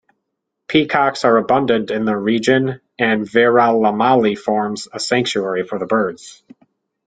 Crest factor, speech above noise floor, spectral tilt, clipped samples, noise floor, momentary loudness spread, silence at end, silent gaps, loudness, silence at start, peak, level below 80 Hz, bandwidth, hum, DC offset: 16 dB; 60 dB; -5 dB/octave; under 0.1%; -76 dBFS; 8 LU; 0.75 s; none; -16 LUFS; 0.7 s; -2 dBFS; -58 dBFS; 9.4 kHz; none; under 0.1%